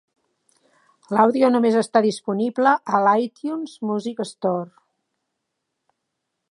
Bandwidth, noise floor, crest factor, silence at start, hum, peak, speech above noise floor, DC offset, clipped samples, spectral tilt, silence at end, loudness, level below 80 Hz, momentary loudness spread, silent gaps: 11 kHz; -79 dBFS; 20 dB; 1.1 s; none; -2 dBFS; 59 dB; under 0.1%; under 0.1%; -6 dB/octave; 1.85 s; -20 LUFS; -78 dBFS; 12 LU; none